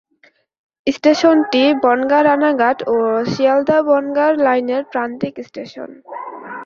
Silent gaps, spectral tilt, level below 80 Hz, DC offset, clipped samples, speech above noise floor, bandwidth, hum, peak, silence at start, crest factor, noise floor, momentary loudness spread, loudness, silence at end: none; -5.5 dB/octave; -60 dBFS; under 0.1%; under 0.1%; 40 dB; 7.2 kHz; none; 0 dBFS; 0.85 s; 16 dB; -55 dBFS; 17 LU; -15 LUFS; 0 s